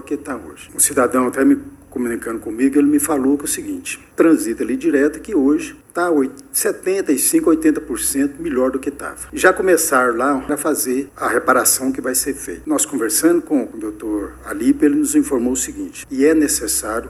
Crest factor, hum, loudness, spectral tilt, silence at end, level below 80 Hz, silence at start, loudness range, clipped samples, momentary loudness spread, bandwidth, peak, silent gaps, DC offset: 18 dB; none; -17 LUFS; -3 dB/octave; 0 s; -46 dBFS; 0 s; 2 LU; under 0.1%; 12 LU; 16 kHz; 0 dBFS; none; under 0.1%